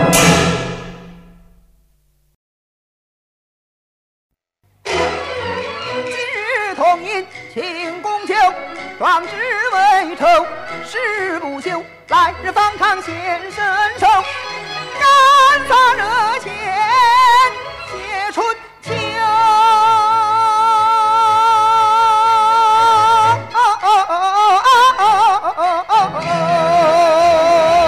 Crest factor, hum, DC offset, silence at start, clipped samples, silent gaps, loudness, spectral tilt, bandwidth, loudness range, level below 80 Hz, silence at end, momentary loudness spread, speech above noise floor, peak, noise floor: 14 dB; none; under 0.1%; 0 s; under 0.1%; 2.35-4.30 s; -13 LUFS; -3 dB/octave; 15.5 kHz; 9 LU; -46 dBFS; 0 s; 13 LU; 45 dB; 0 dBFS; -60 dBFS